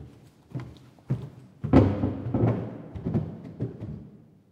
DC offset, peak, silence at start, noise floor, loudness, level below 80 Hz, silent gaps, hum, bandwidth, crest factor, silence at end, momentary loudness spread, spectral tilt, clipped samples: under 0.1%; -4 dBFS; 0 s; -51 dBFS; -28 LUFS; -46 dBFS; none; none; 7 kHz; 24 dB; 0.35 s; 19 LU; -10 dB/octave; under 0.1%